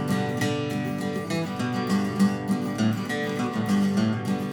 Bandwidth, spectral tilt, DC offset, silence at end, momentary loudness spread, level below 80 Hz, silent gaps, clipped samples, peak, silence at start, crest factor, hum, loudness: 19.5 kHz; -6 dB/octave; under 0.1%; 0 s; 5 LU; -62 dBFS; none; under 0.1%; -10 dBFS; 0 s; 14 dB; none; -26 LUFS